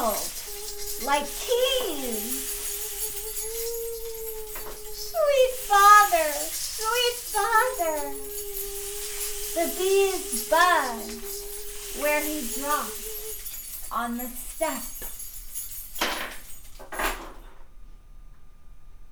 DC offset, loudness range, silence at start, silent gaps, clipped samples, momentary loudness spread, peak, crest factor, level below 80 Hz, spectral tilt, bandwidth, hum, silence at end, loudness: under 0.1%; 11 LU; 0 s; none; under 0.1%; 14 LU; -4 dBFS; 22 dB; -44 dBFS; -1 dB/octave; over 20 kHz; none; 0 s; -25 LUFS